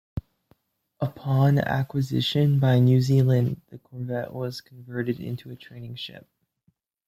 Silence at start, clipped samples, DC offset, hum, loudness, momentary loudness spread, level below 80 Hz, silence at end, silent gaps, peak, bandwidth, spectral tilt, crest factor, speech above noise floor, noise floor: 0.15 s; under 0.1%; under 0.1%; none; -24 LUFS; 19 LU; -56 dBFS; 0.9 s; none; -10 dBFS; 14.5 kHz; -7.5 dB/octave; 16 dB; 46 dB; -70 dBFS